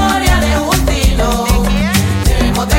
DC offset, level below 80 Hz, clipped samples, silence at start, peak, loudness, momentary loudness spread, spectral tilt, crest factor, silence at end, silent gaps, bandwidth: under 0.1%; -16 dBFS; under 0.1%; 0 s; 0 dBFS; -13 LUFS; 2 LU; -4.5 dB/octave; 12 dB; 0 s; none; 17 kHz